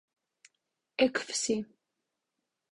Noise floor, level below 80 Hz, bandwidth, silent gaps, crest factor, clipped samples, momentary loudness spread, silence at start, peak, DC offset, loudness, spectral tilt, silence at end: -85 dBFS; -74 dBFS; 11 kHz; none; 24 dB; under 0.1%; 14 LU; 1 s; -10 dBFS; under 0.1%; -31 LUFS; -2.5 dB/octave; 1.1 s